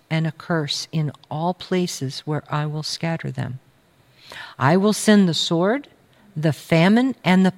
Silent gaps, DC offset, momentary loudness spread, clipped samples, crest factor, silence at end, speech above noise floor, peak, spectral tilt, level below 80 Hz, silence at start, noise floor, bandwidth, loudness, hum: none; under 0.1%; 14 LU; under 0.1%; 18 dB; 0.05 s; 36 dB; -4 dBFS; -5.5 dB/octave; -62 dBFS; 0.1 s; -56 dBFS; 15.5 kHz; -21 LUFS; none